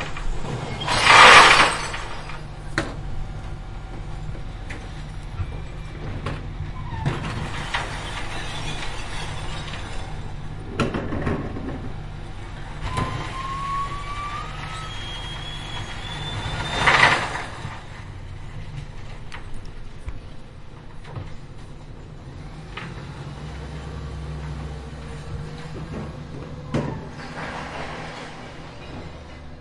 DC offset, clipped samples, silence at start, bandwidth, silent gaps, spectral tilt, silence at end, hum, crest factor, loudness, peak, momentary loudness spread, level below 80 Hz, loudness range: under 0.1%; under 0.1%; 0 s; 12 kHz; none; -3.5 dB/octave; 0 s; none; 24 dB; -21 LUFS; 0 dBFS; 18 LU; -36 dBFS; 19 LU